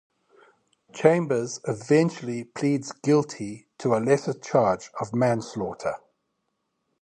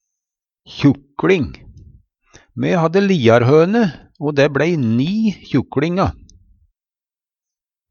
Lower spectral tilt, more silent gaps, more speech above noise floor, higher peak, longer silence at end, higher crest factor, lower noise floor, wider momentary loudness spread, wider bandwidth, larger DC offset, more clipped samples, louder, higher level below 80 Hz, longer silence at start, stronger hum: about the same, -6.5 dB/octave vs -7.5 dB/octave; neither; second, 53 dB vs over 75 dB; about the same, -2 dBFS vs 0 dBFS; second, 1.05 s vs 1.8 s; about the same, 22 dB vs 18 dB; second, -77 dBFS vs under -90 dBFS; first, 12 LU vs 9 LU; first, 11 kHz vs 7.2 kHz; neither; neither; second, -25 LUFS vs -16 LUFS; second, -64 dBFS vs -44 dBFS; first, 0.95 s vs 0.7 s; neither